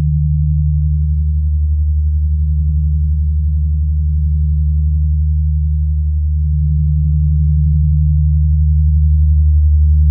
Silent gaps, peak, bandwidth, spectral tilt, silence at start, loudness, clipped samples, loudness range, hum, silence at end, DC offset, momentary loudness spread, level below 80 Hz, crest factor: none; -4 dBFS; 0.3 kHz; -30.5 dB/octave; 0 s; -15 LUFS; under 0.1%; 3 LU; none; 0 s; under 0.1%; 4 LU; -14 dBFS; 8 dB